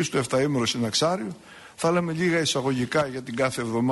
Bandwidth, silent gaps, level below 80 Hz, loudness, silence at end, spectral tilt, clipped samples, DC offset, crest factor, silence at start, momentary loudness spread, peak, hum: 11.5 kHz; none; -60 dBFS; -25 LUFS; 0 s; -4.5 dB/octave; under 0.1%; under 0.1%; 14 dB; 0 s; 7 LU; -12 dBFS; none